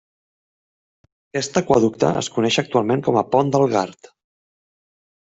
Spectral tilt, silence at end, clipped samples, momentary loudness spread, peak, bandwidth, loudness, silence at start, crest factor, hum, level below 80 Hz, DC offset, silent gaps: -5 dB/octave; 1.35 s; under 0.1%; 7 LU; -2 dBFS; 8.2 kHz; -19 LUFS; 1.35 s; 18 dB; none; -58 dBFS; under 0.1%; none